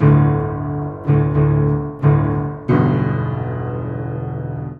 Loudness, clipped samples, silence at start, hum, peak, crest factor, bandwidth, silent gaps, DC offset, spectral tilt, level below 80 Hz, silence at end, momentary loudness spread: -18 LUFS; under 0.1%; 0 s; none; -2 dBFS; 16 dB; 3.5 kHz; none; under 0.1%; -11.5 dB/octave; -36 dBFS; 0 s; 10 LU